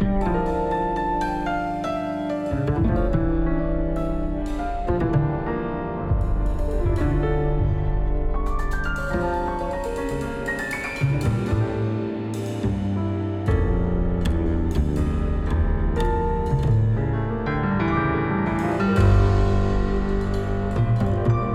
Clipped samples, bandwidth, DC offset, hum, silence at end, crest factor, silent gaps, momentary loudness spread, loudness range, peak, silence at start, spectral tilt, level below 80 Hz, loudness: under 0.1%; 12.5 kHz; under 0.1%; none; 0 s; 16 dB; none; 6 LU; 4 LU; -6 dBFS; 0 s; -8 dB/octave; -26 dBFS; -24 LUFS